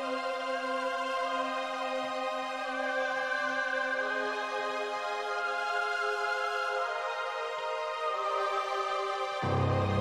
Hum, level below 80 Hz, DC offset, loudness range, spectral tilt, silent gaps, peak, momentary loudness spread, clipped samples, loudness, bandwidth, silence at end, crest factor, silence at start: none; -66 dBFS; under 0.1%; 1 LU; -4.5 dB/octave; none; -18 dBFS; 3 LU; under 0.1%; -32 LUFS; 14 kHz; 0 s; 14 dB; 0 s